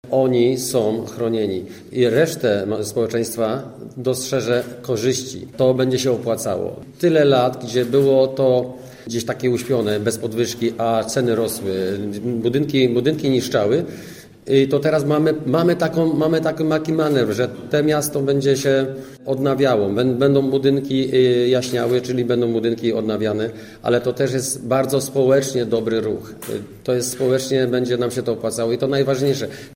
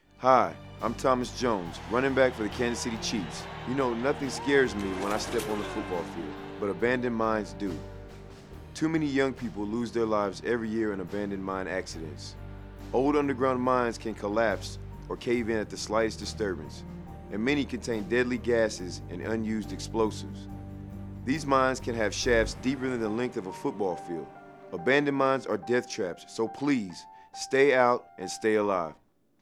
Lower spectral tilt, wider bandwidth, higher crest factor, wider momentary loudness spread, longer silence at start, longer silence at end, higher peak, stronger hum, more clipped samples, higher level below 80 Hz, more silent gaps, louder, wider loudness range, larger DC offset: about the same, -5.5 dB/octave vs -5 dB/octave; about the same, 16 kHz vs 15 kHz; second, 16 dB vs 22 dB; second, 9 LU vs 16 LU; second, 0.05 s vs 0.2 s; second, 0 s vs 0.45 s; first, -2 dBFS vs -6 dBFS; neither; neither; second, -56 dBFS vs -50 dBFS; neither; first, -19 LUFS vs -29 LUFS; about the same, 3 LU vs 4 LU; neither